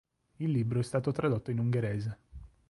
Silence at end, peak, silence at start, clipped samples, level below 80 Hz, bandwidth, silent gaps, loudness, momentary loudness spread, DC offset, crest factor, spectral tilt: 0.2 s; -18 dBFS; 0.4 s; under 0.1%; -56 dBFS; 11.5 kHz; none; -32 LUFS; 7 LU; under 0.1%; 14 dB; -8 dB/octave